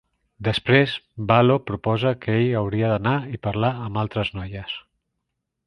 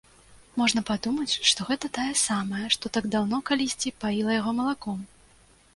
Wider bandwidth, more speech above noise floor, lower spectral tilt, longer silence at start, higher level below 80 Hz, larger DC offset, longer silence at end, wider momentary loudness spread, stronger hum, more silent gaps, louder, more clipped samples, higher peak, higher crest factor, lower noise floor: about the same, 10.5 kHz vs 11.5 kHz; first, 58 dB vs 31 dB; first, -8 dB/octave vs -2.5 dB/octave; about the same, 0.4 s vs 0.3 s; first, -48 dBFS vs -58 dBFS; neither; first, 0.85 s vs 0.7 s; first, 13 LU vs 8 LU; neither; neither; first, -22 LUFS vs -26 LUFS; neither; first, -2 dBFS vs -6 dBFS; about the same, 22 dB vs 22 dB; first, -79 dBFS vs -57 dBFS